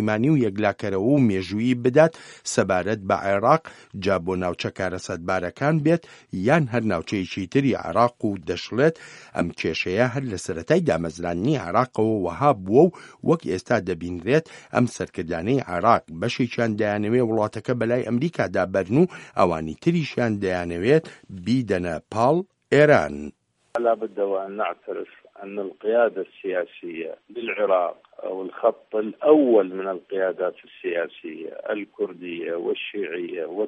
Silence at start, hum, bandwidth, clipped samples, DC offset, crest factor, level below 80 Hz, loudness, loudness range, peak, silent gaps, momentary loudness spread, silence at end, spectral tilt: 0 s; none; 11.5 kHz; under 0.1%; under 0.1%; 22 dB; -56 dBFS; -23 LUFS; 4 LU; -2 dBFS; none; 12 LU; 0 s; -6.5 dB/octave